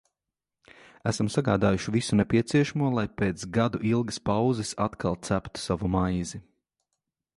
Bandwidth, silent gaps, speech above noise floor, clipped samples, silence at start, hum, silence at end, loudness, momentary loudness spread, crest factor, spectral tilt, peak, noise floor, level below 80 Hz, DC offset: 11.5 kHz; none; 62 dB; under 0.1%; 1.05 s; none; 0.95 s; -27 LUFS; 7 LU; 20 dB; -6 dB/octave; -8 dBFS; -88 dBFS; -48 dBFS; under 0.1%